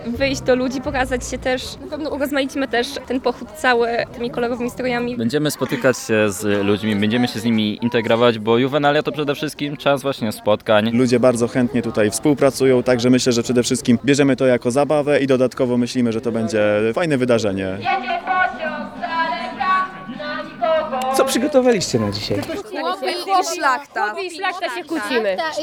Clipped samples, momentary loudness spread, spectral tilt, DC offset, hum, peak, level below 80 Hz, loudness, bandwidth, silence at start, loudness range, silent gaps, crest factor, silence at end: under 0.1%; 8 LU; -5 dB/octave; under 0.1%; none; -2 dBFS; -46 dBFS; -19 LUFS; 18.5 kHz; 0 s; 5 LU; none; 16 dB; 0 s